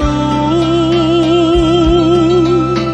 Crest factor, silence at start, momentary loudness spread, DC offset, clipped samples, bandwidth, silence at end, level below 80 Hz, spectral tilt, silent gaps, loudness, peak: 10 dB; 0 s; 3 LU; under 0.1%; under 0.1%; 8.4 kHz; 0 s; -24 dBFS; -7 dB/octave; none; -11 LUFS; 0 dBFS